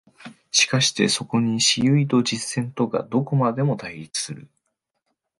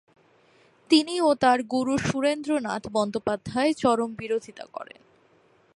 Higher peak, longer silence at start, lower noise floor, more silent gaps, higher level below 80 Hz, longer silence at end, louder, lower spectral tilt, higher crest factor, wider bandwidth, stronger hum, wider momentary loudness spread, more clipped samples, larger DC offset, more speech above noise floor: about the same, -4 dBFS vs -6 dBFS; second, 0.2 s vs 0.9 s; first, -77 dBFS vs -61 dBFS; neither; about the same, -62 dBFS vs -60 dBFS; about the same, 0.95 s vs 0.95 s; first, -21 LUFS vs -25 LUFS; about the same, -4 dB/octave vs -4.5 dB/octave; about the same, 18 dB vs 20 dB; about the same, 11.5 kHz vs 11.5 kHz; neither; second, 10 LU vs 16 LU; neither; neither; first, 55 dB vs 36 dB